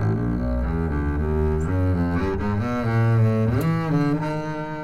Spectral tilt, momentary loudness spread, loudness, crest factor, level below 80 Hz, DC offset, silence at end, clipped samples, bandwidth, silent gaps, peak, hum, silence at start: -9 dB/octave; 5 LU; -23 LUFS; 12 dB; -32 dBFS; under 0.1%; 0 s; under 0.1%; 13 kHz; none; -10 dBFS; none; 0 s